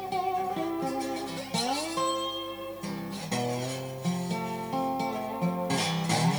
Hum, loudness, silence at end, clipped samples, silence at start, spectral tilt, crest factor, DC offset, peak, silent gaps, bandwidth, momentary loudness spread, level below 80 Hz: 50 Hz at -55 dBFS; -31 LUFS; 0 s; under 0.1%; 0 s; -4.5 dB/octave; 18 dB; under 0.1%; -12 dBFS; none; over 20 kHz; 7 LU; -62 dBFS